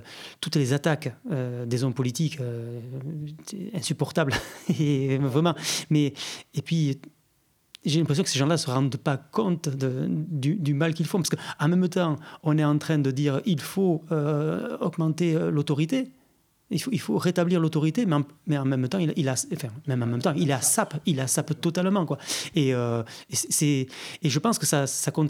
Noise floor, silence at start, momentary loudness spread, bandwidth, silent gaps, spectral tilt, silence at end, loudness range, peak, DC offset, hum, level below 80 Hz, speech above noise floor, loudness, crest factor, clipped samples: -67 dBFS; 0 s; 8 LU; 16.5 kHz; none; -5 dB/octave; 0 s; 3 LU; -8 dBFS; under 0.1%; none; -64 dBFS; 42 dB; -26 LUFS; 18 dB; under 0.1%